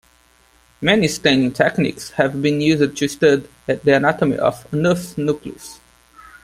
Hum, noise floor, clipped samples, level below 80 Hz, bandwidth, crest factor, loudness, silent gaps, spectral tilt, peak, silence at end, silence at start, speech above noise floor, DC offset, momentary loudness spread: none; -55 dBFS; under 0.1%; -52 dBFS; 15.5 kHz; 18 dB; -18 LUFS; none; -5 dB/octave; 0 dBFS; 0.7 s; 0.8 s; 37 dB; under 0.1%; 7 LU